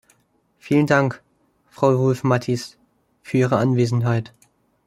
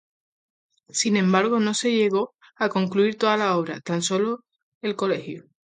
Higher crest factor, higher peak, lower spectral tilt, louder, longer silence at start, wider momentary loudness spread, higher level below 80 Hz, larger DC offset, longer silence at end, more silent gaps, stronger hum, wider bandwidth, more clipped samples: about the same, 20 dB vs 18 dB; first, -2 dBFS vs -6 dBFS; first, -7.5 dB/octave vs -4.5 dB/octave; first, -20 LUFS vs -23 LUFS; second, 0.65 s vs 0.95 s; about the same, 9 LU vs 11 LU; first, -60 dBFS vs -72 dBFS; neither; first, 0.65 s vs 0.35 s; second, none vs 4.63-4.81 s; neither; first, 12.5 kHz vs 9.6 kHz; neither